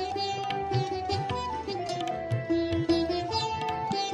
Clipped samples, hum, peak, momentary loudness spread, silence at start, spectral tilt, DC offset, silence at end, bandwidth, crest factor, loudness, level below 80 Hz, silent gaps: under 0.1%; none; -14 dBFS; 5 LU; 0 s; -5.5 dB/octave; under 0.1%; 0 s; 11.5 kHz; 16 dB; -30 LUFS; -50 dBFS; none